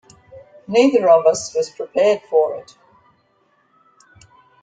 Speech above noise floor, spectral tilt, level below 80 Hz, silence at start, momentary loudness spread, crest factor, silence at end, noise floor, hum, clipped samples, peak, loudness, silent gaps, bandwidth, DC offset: 45 dB; -4 dB/octave; -64 dBFS; 0.35 s; 11 LU; 18 dB; 2 s; -61 dBFS; none; under 0.1%; -2 dBFS; -17 LUFS; none; 9.4 kHz; under 0.1%